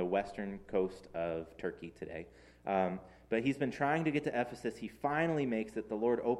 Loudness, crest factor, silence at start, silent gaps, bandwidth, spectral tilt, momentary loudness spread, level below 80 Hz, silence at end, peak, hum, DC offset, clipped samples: -36 LUFS; 18 dB; 0 s; none; 12.5 kHz; -7 dB/octave; 13 LU; -64 dBFS; 0 s; -18 dBFS; none; under 0.1%; under 0.1%